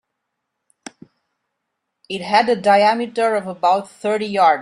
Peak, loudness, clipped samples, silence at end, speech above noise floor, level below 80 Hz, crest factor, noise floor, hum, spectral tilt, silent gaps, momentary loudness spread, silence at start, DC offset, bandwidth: -2 dBFS; -17 LUFS; under 0.1%; 0 s; 60 dB; -68 dBFS; 18 dB; -77 dBFS; none; -4.5 dB/octave; none; 8 LU; 2.1 s; under 0.1%; 11.5 kHz